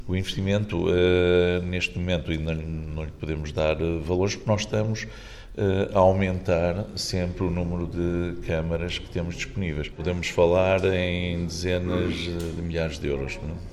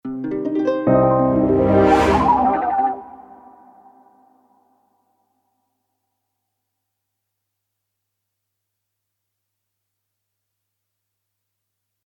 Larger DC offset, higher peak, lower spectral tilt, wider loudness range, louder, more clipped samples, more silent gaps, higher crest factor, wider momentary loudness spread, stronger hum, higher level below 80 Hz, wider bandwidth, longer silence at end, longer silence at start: neither; about the same, -6 dBFS vs -4 dBFS; second, -6 dB/octave vs -8 dB/octave; second, 3 LU vs 12 LU; second, -26 LUFS vs -17 LUFS; neither; neither; about the same, 18 dB vs 18 dB; about the same, 11 LU vs 9 LU; neither; about the same, -40 dBFS vs -42 dBFS; first, 13 kHz vs 11.5 kHz; second, 0 s vs 8.85 s; about the same, 0 s vs 0.05 s